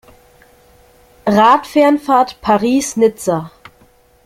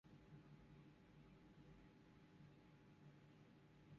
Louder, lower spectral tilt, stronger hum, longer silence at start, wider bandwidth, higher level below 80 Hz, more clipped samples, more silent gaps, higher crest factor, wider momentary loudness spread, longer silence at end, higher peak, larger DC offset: first, -14 LUFS vs -68 LUFS; second, -5 dB/octave vs -6.5 dB/octave; neither; first, 1.25 s vs 0.05 s; first, 16 kHz vs 7 kHz; first, -50 dBFS vs -78 dBFS; neither; neither; about the same, 14 dB vs 14 dB; first, 10 LU vs 3 LU; first, 0.75 s vs 0 s; first, 0 dBFS vs -54 dBFS; neither